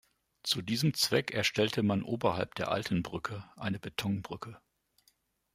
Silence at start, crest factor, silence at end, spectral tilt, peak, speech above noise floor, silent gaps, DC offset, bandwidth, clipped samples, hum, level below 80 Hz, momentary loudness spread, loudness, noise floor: 0.45 s; 20 dB; 0.95 s; -4.5 dB/octave; -12 dBFS; 40 dB; none; under 0.1%; 16 kHz; under 0.1%; none; -64 dBFS; 11 LU; -32 LUFS; -72 dBFS